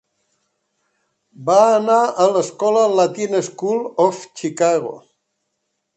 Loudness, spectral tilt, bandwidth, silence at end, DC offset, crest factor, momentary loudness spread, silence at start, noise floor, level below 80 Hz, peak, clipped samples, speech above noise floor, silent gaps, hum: -17 LUFS; -4.5 dB/octave; 8.8 kHz; 1 s; under 0.1%; 18 dB; 10 LU; 1.4 s; -74 dBFS; -72 dBFS; -2 dBFS; under 0.1%; 57 dB; none; none